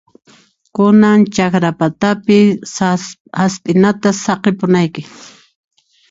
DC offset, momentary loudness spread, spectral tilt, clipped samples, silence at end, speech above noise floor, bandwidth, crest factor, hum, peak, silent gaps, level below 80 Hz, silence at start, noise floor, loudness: under 0.1%; 10 LU; -6 dB/octave; under 0.1%; 1.1 s; 37 dB; 7.8 kHz; 14 dB; none; 0 dBFS; 3.20-3.25 s; -54 dBFS; 0.75 s; -49 dBFS; -13 LUFS